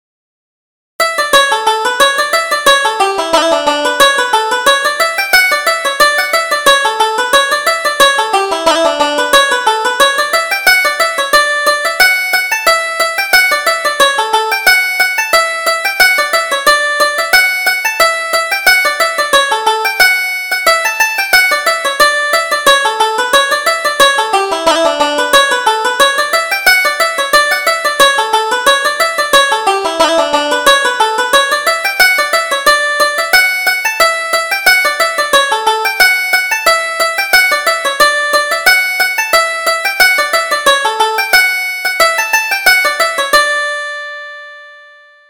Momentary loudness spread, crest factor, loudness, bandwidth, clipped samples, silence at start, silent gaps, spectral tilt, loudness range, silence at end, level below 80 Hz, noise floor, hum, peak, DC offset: 4 LU; 12 dB; -10 LUFS; over 20 kHz; 0.2%; 1 s; none; 0.5 dB/octave; 1 LU; 0.5 s; -46 dBFS; -40 dBFS; none; 0 dBFS; under 0.1%